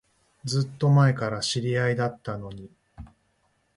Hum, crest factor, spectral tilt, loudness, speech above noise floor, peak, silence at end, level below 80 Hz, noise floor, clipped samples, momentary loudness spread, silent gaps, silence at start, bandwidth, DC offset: none; 18 dB; -6 dB/octave; -25 LUFS; 45 dB; -10 dBFS; 0.7 s; -56 dBFS; -69 dBFS; under 0.1%; 18 LU; none; 0.45 s; 11 kHz; under 0.1%